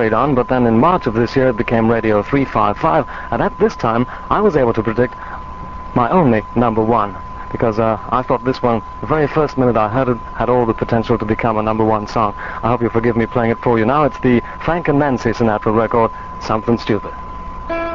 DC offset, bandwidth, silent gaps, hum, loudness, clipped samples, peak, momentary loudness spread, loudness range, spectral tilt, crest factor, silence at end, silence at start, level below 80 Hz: 1%; 7.2 kHz; none; none; -16 LUFS; under 0.1%; -2 dBFS; 7 LU; 2 LU; -8 dB/octave; 14 dB; 0 s; 0 s; -34 dBFS